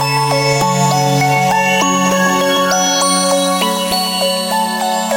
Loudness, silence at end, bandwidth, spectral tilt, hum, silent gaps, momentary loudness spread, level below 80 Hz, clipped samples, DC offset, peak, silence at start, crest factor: -13 LUFS; 0 s; 17.5 kHz; -3.5 dB/octave; none; none; 3 LU; -52 dBFS; under 0.1%; under 0.1%; 0 dBFS; 0 s; 12 dB